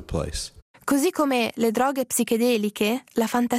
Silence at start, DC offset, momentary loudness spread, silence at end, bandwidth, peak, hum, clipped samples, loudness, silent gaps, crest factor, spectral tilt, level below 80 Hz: 0 s; under 0.1%; 9 LU; 0 s; 16 kHz; -8 dBFS; none; under 0.1%; -23 LUFS; 0.62-0.74 s; 16 dB; -4 dB/octave; -46 dBFS